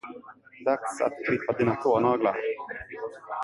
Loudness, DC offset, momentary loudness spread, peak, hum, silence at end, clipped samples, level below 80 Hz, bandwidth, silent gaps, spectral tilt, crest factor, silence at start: -27 LUFS; under 0.1%; 14 LU; -10 dBFS; none; 0 s; under 0.1%; -62 dBFS; 11.5 kHz; none; -6.5 dB/octave; 18 dB; 0.05 s